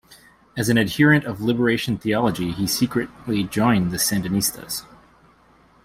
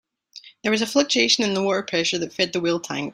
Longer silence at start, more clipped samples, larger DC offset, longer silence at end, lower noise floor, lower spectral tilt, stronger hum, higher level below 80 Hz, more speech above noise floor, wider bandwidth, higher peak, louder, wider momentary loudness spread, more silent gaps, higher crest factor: first, 0.55 s vs 0.35 s; neither; neither; first, 1.05 s vs 0 s; first, -55 dBFS vs -47 dBFS; first, -4.5 dB/octave vs -3 dB/octave; neither; first, -50 dBFS vs -64 dBFS; first, 34 dB vs 25 dB; about the same, 16 kHz vs 16 kHz; about the same, -4 dBFS vs -4 dBFS; about the same, -21 LUFS vs -21 LUFS; first, 10 LU vs 7 LU; neither; about the same, 18 dB vs 18 dB